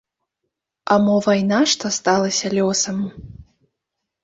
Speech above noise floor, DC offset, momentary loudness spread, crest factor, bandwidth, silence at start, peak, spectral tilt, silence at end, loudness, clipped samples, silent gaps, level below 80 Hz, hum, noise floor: 62 dB; under 0.1%; 8 LU; 18 dB; 7.8 kHz; 0.85 s; -2 dBFS; -4 dB/octave; 0.8 s; -18 LUFS; under 0.1%; none; -54 dBFS; none; -80 dBFS